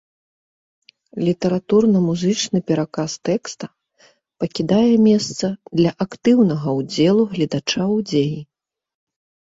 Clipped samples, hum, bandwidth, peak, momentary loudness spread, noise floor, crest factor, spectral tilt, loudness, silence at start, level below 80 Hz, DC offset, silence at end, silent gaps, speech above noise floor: under 0.1%; none; 8 kHz; -4 dBFS; 10 LU; -56 dBFS; 16 dB; -6 dB/octave; -19 LUFS; 1.15 s; -58 dBFS; under 0.1%; 1 s; none; 38 dB